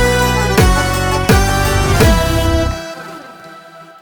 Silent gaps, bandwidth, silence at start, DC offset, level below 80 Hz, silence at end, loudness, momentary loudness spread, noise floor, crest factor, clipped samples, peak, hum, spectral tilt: none; over 20 kHz; 0 s; under 0.1%; -20 dBFS; 0.2 s; -13 LUFS; 17 LU; -37 dBFS; 12 dB; under 0.1%; 0 dBFS; none; -5 dB/octave